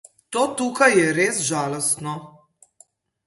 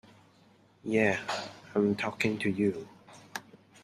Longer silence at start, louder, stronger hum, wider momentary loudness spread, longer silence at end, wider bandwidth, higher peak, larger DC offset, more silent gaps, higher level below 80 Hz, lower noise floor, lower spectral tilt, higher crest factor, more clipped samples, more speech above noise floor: second, 0.3 s vs 0.85 s; first, -20 LUFS vs -30 LUFS; neither; second, 12 LU vs 16 LU; first, 0.95 s vs 0.45 s; second, 12 kHz vs 13.5 kHz; first, -2 dBFS vs -12 dBFS; neither; neither; about the same, -66 dBFS vs -70 dBFS; second, -57 dBFS vs -62 dBFS; second, -3.5 dB/octave vs -5.5 dB/octave; about the same, 22 dB vs 22 dB; neither; about the same, 36 dB vs 33 dB